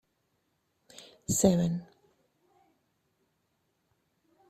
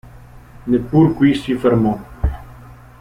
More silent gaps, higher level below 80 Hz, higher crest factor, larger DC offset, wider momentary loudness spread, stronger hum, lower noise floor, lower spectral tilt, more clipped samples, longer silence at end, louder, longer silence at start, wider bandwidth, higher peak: neither; second, -62 dBFS vs -32 dBFS; first, 26 dB vs 16 dB; neither; first, 20 LU vs 11 LU; neither; first, -77 dBFS vs -40 dBFS; second, -5.5 dB/octave vs -8.5 dB/octave; neither; first, 2.65 s vs 0.3 s; second, -28 LUFS vs -17 LUFS; first, 1.3 s vs 0.35 s; about the same, 15 kHz vs 14.5 kHz; second, -10 dBFS vs -2 dBFS